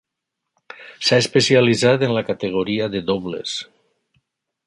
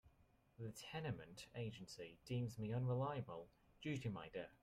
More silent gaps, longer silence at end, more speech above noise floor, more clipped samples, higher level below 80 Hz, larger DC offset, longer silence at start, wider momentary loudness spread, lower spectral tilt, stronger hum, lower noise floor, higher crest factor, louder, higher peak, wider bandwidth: neither; first, 1.05 s vs 0.1 s; first, 62 dB vs 28 dB; neither; first, -56 dBFS vs -74 dBFS; neither; first, 0.8 s vs 0.05 s; about the same, 13 LU vs 12 LU; second, -4.5 dB/octave vs -6.5 dB/octave; neither; first, -81 dBFS vs -75 dBFS; about the same, 18 dB vs 16 dB; first, -18 LUFS vs -48 LUFS; first, -2 dBFS vs -32 dBFS; second, 11.5 kHz vs 14 kHz